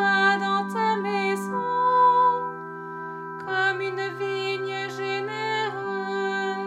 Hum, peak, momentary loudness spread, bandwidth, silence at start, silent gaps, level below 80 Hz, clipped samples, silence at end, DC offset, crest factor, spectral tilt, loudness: none; -10 dBFS; 15 LU; 15 kHz; 0 s; none; -80 dBFS; under 0.1%; 0 s; under 0.1%; 16 dB; -4.5 dB/octave; -24 LUFS